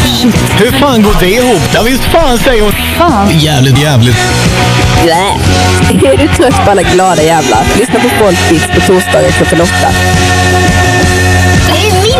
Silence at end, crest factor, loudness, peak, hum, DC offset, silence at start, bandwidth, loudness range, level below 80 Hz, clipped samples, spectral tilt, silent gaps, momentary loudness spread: 0 s; 6 dB; -7 LUFS; 0 dBFS; none; under 0.1%; 0 s; 16 kHz; 0 LU; -20 dBFS; 1%; -4.5 dB/octave; none; 2 LU